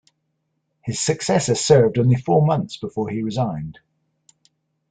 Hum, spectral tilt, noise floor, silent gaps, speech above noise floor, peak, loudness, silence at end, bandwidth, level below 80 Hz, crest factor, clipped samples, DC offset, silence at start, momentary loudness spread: none; -5.5 dB/octave; -73 dBFS; none; 54 dB; -2 dBFS; -19 LUFS; 1.2 s; 9.4 kHz; -54 dBFS; 20 dB; under 0.1%; under 0.1%; 0.85 s; 14 LU